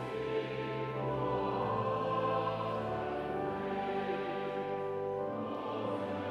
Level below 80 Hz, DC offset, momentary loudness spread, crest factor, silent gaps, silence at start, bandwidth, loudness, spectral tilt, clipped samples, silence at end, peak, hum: -62 dBFS; under 0.1%; 4 LU; 14 dB; none; 0 s; 11.5 kHz; -36 LUFS; -7.5 dB/octave; under 0.1%; 0 s; -22 dBFS; none